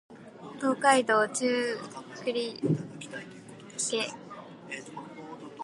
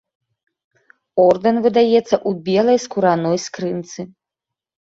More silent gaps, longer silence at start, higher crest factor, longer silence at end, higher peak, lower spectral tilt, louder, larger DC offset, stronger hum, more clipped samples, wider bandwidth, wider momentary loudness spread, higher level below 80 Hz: neither; second, 0.1 s vs 1.15 s; first, 24 dB vs 16 dB; second, 0 s vs 0.9 s; second, -8 dBFS vs -2 dBFS; second, -3.5 dB/octave vs -5.5 dB/octave; second, -29 LUFS vs -17 LUFS; neither; neither; neither; first, 11.5 kHz vs 7.8 kHz; first, 22 LU vs 13 LU; second, -76 dBFS vs -60 dBFS